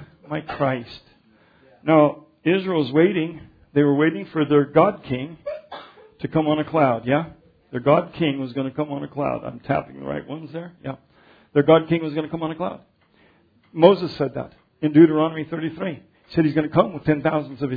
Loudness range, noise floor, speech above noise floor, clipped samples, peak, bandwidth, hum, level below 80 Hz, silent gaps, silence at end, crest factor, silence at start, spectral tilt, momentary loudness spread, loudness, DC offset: 5 LU; -58 dBFS; 37 dB; under 0.1%; 0 dBFS; 5 kHz; none; -56 dBFS; none; 0 s; 22 dB; 0 s; -10 dB/octave; 17 LU; -21 LUFS; under 0.1%